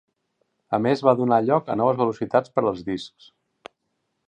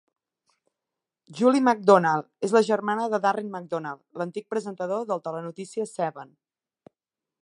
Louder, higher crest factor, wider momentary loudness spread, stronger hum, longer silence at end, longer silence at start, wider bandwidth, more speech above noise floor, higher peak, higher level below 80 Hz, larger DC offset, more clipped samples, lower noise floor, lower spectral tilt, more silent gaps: first, -22 LUFS vs -25 LUFS; about the same, 20 dB vs 24 dB; second, 11 LU vs 15 LU; neither; about the same, 1.2 s vs 1.2 s; second, 0.7 s vs 1.3 s; second, 9.4 kHz vs 11.5 kHz; second, 54 dB vs 64 dB; about the same, -4 dBFS vs -2 dBFS; first, -62 dBFS vs -80 dBFS; neither; neither; second, -76 dBFS vs -88 dBFS; first, -7.5 dB/octave vs -6 dB/octave; neither